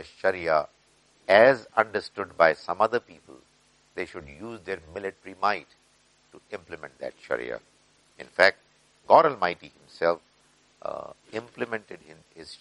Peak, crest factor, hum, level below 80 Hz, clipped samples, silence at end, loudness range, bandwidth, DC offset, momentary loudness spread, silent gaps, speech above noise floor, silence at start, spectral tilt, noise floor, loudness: -2 dBFS; 26 dB; none; -66 dBFS; under 0.1%; 0.05 s; 11 LU; 11.5 kHz; under 0.1%; 22 LU; none; 37 dB; 0 s; -5 dB/octave; -63 dBFS; -25 LUFS